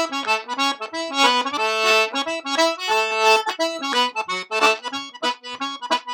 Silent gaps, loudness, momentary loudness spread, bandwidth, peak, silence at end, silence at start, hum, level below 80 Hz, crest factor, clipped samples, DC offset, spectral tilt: none; -20 LUFS; 9 LU; 18.5 kHz; -2 dBFS; 0 s; 0 s; none; -80 dBFS; 20 dB; under 0.1%; under 0.1%; 0 dB/octave